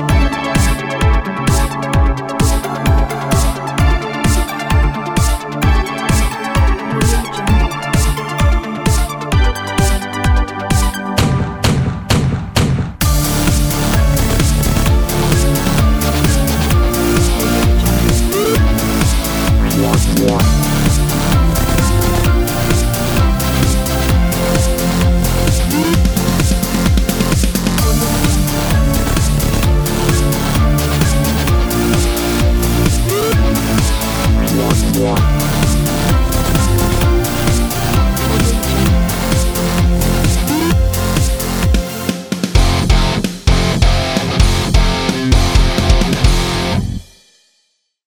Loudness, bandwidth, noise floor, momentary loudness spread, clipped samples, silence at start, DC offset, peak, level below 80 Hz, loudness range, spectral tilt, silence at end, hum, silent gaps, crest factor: -14 LUFS; over 20 kHz; -63 dBFS; 3 LU; under 0.1%; 0 s; under 0.1%; 0 dBFS; -16 dBFS; 2 LU; -5 dB/octave; 1.05 s; none; none; 12 dB